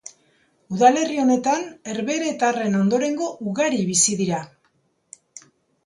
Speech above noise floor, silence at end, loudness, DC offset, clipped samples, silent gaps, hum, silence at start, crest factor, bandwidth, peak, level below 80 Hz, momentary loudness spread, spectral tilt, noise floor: 46 dB; 0.45 s; -21 LUFS; under 0.1%; under 0.1%; none; none; 0.05 s; 20 dB; 11.5 kHz; -2 dBFS; -66 dBFS; 13 LU; -4 dB/octave; -66 dBFS